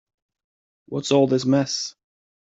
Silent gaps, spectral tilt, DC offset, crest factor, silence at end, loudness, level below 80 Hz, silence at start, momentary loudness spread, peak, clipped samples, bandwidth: none; -5 dB/octave; under 0.1%; 20 dB; 0.65 s; -21 LUFS; -66 dBFS; 0.9 s; 13 LU; -6 dBFS; under 0.1%; 8 kHz